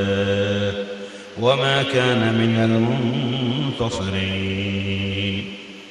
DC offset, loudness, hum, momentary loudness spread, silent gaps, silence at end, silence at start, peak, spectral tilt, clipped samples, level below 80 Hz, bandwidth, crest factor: under 0.1%; -21 LUFS; none; 11 LU; none; 0 s; 0 s; -6 dBFS; -6 dB/octave; under 0.1%; -52 dBFS; 11 kHz; 16 dB